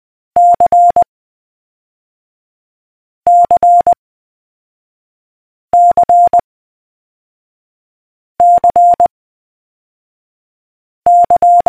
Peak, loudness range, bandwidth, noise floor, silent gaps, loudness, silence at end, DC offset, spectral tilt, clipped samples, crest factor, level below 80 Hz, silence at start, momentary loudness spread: -2 dBFS; 2 LU; 9.2 kHz; under -90 dBFS; 1.08-3.22 s, 3.98-5.68 s, 6.44-8.35 s, 9.10-11.02 s; -9 LUFS; 0.05 s; under 0.1%; -6 dB/octave; under 0.1%; 12 dB; -50 dBFS; 0.35 s; 8 LU